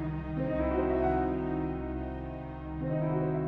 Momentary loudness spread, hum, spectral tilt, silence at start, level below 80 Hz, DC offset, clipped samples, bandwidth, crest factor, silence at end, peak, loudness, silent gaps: 11 LU; none; -11 dB/octave; 0 s; -42 dBFS; under 0.1%; under 0.1%; 4.6 kHz; 14 dB; 0 s; -18 dBFS; -32 LUFS; none